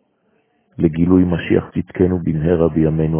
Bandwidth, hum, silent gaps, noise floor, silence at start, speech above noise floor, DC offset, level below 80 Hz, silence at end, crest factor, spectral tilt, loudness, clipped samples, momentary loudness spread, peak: 3.5 kHz; none; none; -62 dBFS; 0.8 s; 47 dB; under 0.1%; -34 dBFS; 0 s; 16 dB; -13 dB/octave; -17 LUFS; under 0.1%; 5 LU; 0 dBFS